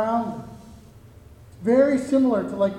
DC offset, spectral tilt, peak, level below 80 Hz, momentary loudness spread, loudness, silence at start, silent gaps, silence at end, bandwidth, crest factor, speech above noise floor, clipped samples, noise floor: under 0.1%; -7 dB/octave; -6 dBFS; -54 dBFS; 16 LU; -21 LUFS; 0 s; none; 0 s; 11.5 kHz; 18 dB; 26 dB; under 0.1%; -47 dBFS